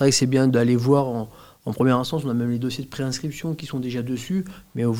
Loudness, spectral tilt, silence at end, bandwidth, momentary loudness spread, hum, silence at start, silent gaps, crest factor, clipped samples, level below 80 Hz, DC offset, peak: -23 LUFS; -5.5 dB/octave; 0 s; 16.5 kHz; 12 LU; none; 0 s; none; 18 dB; under 0.1%; -56 dBFS; 0.2%; -4 dBFS